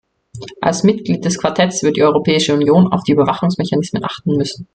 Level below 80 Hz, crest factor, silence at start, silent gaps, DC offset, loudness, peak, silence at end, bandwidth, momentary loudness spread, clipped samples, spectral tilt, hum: -52 dBFS; 14 dB; 0.35 s; none; under 0.1%; -15 LUFS; 0 dBFS; 0.1 s; 9.2 kHz; 7 LU; under 0.1%; -5.5 dB/octave; none